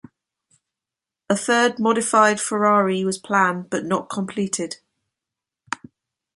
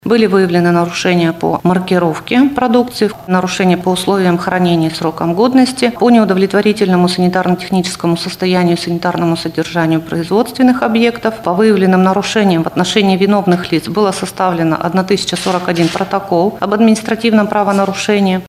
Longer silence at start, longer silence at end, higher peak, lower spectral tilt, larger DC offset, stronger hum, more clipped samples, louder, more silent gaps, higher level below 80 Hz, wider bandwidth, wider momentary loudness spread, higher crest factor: first, 1.3 s vs 0.05 s; first, 0.6 s vs 0 s; about the same, -2 dBFS vs 0 dBFS; second, -4 dB/octave vs -6 dB/octave; neither; neither; neither; second, -20 LUFS vs -13 LUFS; neither; second, -68 dBFS vs -48 dBFS; second, 11.5 kHz vs 15 kHz; first, 16 LU vs 5 LU; first, 20 dB vs 12 dB